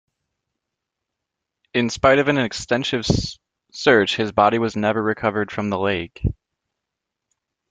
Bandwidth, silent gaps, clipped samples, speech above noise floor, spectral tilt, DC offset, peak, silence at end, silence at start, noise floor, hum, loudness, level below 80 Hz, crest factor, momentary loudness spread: 9.4 kHz; none; under 0.1%; 63 dB; -5 dB/octave; under 0.1%; 0 dBFS; 1.4 s; 1.75 s; -82 dBFS; none; -20 LUFS; -42 dBFS; 22 dB; 10 LU